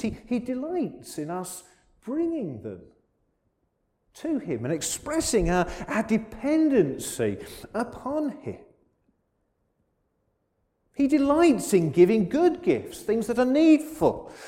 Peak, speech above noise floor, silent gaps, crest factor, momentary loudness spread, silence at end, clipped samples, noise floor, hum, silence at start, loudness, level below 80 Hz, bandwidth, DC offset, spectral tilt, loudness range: -6 dBFS; 49 dB; none; 20 dB; 17 LU; 0 s; under 0.1%; -74 dBFS; none; 0 s; -25 LUFS; -48 dBFS; 16.5 kHz; under 0.1%; -5.5 dB/octave; 13 LU